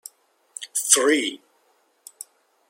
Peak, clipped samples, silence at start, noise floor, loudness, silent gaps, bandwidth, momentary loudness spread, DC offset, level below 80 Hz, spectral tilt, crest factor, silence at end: 0 dBFS; under 0.1%; 0.6 s; -64 dBFS; -20 LUFS; none; 16.5 kHz; 25 LU; under 0.1%; -84 dBFS; 1 dB/octave; 26 dB; 1.35 s